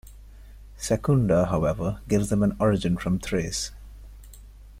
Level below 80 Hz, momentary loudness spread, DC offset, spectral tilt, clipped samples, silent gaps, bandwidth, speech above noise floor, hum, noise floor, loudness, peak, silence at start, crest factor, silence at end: -42 dBFS; 8 LU; under 0.1%; -6 dB/octave; under 0.1%; none; 16 kHz; 22 dB; none; -45 dBFS; -25 LUFS; -8 dBFS; 0.05 s; 16 dB; 0 s